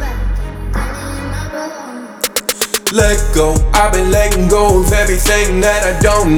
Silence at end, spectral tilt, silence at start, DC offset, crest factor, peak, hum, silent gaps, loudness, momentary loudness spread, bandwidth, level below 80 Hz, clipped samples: 0 s; -4 dB/octave; 0 s; under 0.1%; 12 dB; 0 dBFS; none; none; -14 LUFS; 12 LU; over 20 kHz; -18 dBFS; under 0.1%